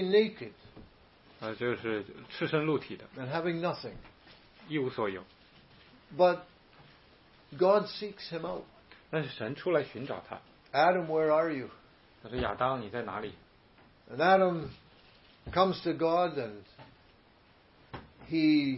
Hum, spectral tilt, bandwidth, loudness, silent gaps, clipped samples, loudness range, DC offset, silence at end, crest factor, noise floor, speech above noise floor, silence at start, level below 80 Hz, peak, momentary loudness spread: none; -9.5 dB/octave; 5.8 kHz; -31 LUFS; none; under 0.1%; 5 LU; under 0.1%; 0 s; 20 dB; -62 dBFS; 32 dB; 0 s; -62 dBFS; -12 dBFS; 19 LU